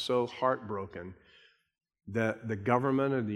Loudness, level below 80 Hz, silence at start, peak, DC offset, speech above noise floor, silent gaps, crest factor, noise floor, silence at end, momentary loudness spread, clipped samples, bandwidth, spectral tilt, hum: -31 LUFS; -70 dBFS; 0 s; -12 dBFS; under 0.1%; 32 dB; none; 22 dB; -63 dBFS; 0 s; 14 LU; under 0.1%; 12.5 kHz; -7 dB/octave; none